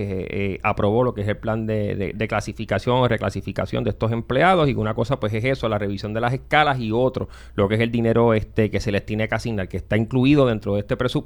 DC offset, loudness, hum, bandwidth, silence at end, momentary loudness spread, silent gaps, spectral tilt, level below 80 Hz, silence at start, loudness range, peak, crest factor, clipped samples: under 0.1%; -22 LUFS; none; 19 kHz; 0 s; 8 LU; none; -7 dB/octave; -40 dBFS; 0 s; 2 LU; -2 dBFS; 18 dB; under 0.1%